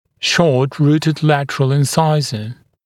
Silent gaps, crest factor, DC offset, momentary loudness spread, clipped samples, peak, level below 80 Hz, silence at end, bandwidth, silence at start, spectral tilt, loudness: none; 16 dB; under 0.1%; 8 LU; under 0.1%; 0 dBFS; -56 dBFS; 0.35 s; 14 kHz; 0.2 s; -5.5 dB/octave; -15 LUFS